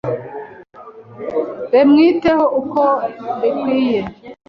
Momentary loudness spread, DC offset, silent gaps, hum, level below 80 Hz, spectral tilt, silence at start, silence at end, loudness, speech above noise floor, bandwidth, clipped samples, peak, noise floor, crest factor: 19 LU; under 0.1%; none; none; -52 dBFS; -8 dB/octave; 0.05 s; 0.15 s; -16 LUFS; 24 dB; 6 kHz; under 0.1%; -2 dBFS; -39 dBFS; 14 dB